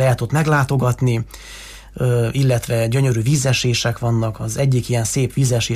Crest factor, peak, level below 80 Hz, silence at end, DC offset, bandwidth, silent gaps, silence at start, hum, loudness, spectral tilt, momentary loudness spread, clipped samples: 12 dB; -6 dBFS; -40 dBFS; 0 s; under 0.1%; 15.5 kHz; none; 0 s; none; -18 LUFS; -5.5 dB/octave; 7 LU; under 0.1%